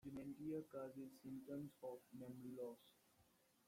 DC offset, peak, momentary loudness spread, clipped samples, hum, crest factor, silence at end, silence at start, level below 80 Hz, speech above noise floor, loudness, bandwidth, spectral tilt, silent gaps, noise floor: under 0.1%; -38 dBFS; 7 LU; under 0.1%; none; 16 dB; 0.45 s; 0.05 s; -84 dBFS; 23 dB; -54 LUFS; 16.5 kHz; -7.5 dB/octave; none; -78 dBFS